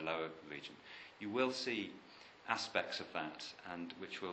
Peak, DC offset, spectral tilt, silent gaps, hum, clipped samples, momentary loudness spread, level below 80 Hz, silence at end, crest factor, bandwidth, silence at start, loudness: -18 dBFS; under 0.1%; -3.5 dB/octave; none; none; under 0.1%; 16 LU; -80 dBFS; 0 s; 26 dB; 8.4 kHz; 0 s; -42 LUFS